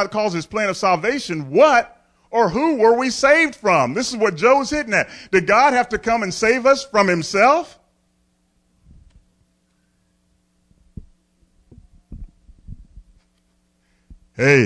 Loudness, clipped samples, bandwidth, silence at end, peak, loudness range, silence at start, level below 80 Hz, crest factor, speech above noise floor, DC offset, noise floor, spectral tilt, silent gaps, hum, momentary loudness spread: -17 LUFS; under 0.1%; 11 kHz; 0 s; -2 dBFS; 5 LU; 0 s; -48 dBFS; 18 dB; 47 dB; under 0.1%; -64 dBFS; -4.5 dB/octave; none; none; 8 LU